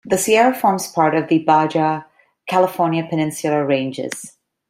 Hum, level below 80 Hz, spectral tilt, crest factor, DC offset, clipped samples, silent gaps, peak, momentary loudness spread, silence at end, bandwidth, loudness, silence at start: none; -62 dBFS; -5 dB/octave; 16 dB; under 0.1%; under 0.1%; none; -2 dBFS; 13 LU; 0.4 s; 16 kHz; -18 LUFS; 0.05 s